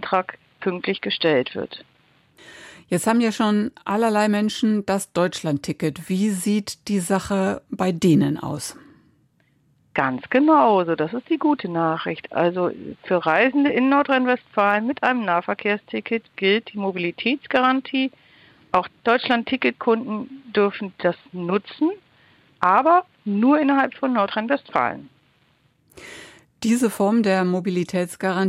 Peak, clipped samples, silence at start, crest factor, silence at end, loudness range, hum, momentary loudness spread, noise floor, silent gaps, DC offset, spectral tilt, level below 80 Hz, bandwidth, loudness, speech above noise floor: -2 dBFS; under 0.1%; 0 s; 20 dB; 0 s; 4 LU; none; 10 LU; -62 dBFS; none; under 0.1%; -5.5 dB/octave; -62 dBFS; 15 kHz; -21 LUFS; 41 dB